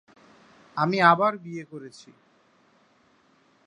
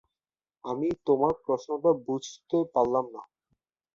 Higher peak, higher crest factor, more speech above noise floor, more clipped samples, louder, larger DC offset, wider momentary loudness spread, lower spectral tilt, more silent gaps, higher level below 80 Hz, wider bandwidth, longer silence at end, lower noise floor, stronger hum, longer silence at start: first, -4 dBFS vs -10 dBFS; about the same, 24 dB vs 20 dB; second, 38 dB vs over 63 dB; neither; first, -22 LUFS vs -28 LUFS; neither; first, 23 LU vs 12 LU; about the same, -6 dB/octave vs -7 dB/octave; neither; second, -76 dBFS vs -64 dBFS; first, 10.5 kHz vs 7.6 kHz; first, 1.8 s vs 0.7 s; second, -62 dBFS vs under -90 dBFS; neither; about the same, 0.75 s vs 0.65 s